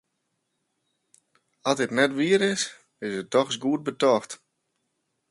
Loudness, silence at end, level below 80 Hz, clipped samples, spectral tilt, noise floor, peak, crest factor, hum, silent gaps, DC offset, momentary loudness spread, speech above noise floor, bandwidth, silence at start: -25 LUFS; 0.95 s; -72 dBFS; under 0.1%; -4 dB/octave; -78 dBFS; -6 dBFS; 22 dB; none; none; under 0.1%; 11 LU; 54 dB; 11.5 kHz; 1.65 s